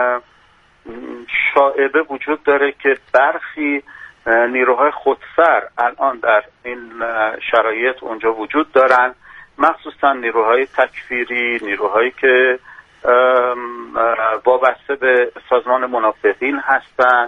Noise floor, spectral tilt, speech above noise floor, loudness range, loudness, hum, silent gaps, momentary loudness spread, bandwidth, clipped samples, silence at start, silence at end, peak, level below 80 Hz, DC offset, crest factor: -52 dBFS; -5 dB/octave; 36 dB; 2 LU; -16 LUFS; none; none; 9 LU; 7 kHz; under 0.1%; 0 s; 0 s; 0 dBFS; -58 dBFS; under 0.1%; 16 dB